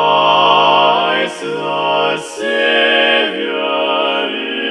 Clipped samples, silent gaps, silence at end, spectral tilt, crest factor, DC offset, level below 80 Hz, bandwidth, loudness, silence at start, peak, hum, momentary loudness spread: under 0.1%; none; 0 s; -3 dB/octave; 14 dB; under 0.1%; -66 dBFS; 12 kHz; -13 LUFS; 0 s; 0 dBFS; none; 9 LU